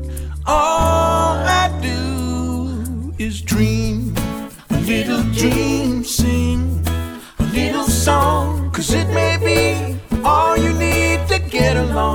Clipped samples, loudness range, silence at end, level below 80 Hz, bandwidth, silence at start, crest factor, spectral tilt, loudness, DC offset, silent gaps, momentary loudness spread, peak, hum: under 0.1%; 4 LU; 0 s; -26 dBFS; 20 kHz; 0 s; 14 dB; -5 dB/octave; -17 LUFS; under 0.1%; none; 9 LU; -2 dBFS; none